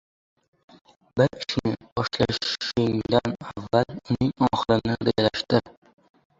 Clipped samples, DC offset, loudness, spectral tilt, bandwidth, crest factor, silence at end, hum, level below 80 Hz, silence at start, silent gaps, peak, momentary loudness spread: under 0.1%; under 0.1%; -25 LUFS; -6 dB/octave; 7.8 kHz; 22 dB; 0.7 s; none; -52 dBFS; 1.15 s; 1.92-1.96 s; -4 dBFS; 6 LU